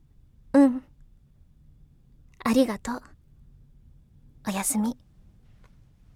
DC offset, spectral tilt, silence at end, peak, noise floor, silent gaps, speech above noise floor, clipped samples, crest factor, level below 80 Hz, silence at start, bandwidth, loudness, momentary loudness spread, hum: under 0.1%; -4.5 dB/octave; 1.25 s; -8 dBFS; -56 dBFS; none; 30 dB; under 0.1%; 20 dB; -54 dBFS; 0.55 s; 17 kHz; -25 LUFS; 16 LU; none